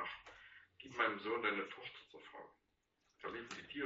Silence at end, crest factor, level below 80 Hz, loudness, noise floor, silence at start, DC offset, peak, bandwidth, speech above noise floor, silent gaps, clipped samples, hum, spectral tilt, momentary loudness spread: 0 s; 24 dB; -80 dBFS; -42 LUFS; -81 dBFS; 0 s; under 0.1%; -22 dBFS; 7.6 kHz; 38 dB; none; under 0.1%; none; -1 dB/octave; 20 LU